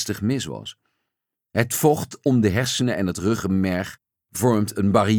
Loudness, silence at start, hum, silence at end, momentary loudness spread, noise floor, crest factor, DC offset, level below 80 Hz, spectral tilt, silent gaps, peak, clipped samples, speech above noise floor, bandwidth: -22 LUFS; 0 s; none; 0 s; 12 LU; -83 dBFS; 18 dB; under 0.1%; -54 dBFS; -5.5 dB/octave; none; -4 dBFS; under 0.1%; 61 dB; over 20 kHz